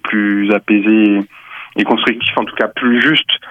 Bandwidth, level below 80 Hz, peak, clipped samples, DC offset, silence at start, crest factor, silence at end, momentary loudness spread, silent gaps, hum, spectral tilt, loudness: 5.6 kHz; -60 dBFS; 0 dBFS; under 0.1%; under 0.1%; 0.05 s; 12 dB; 0 s; 8 LU; none; none; -6.5 dB/octave; -13 LUFS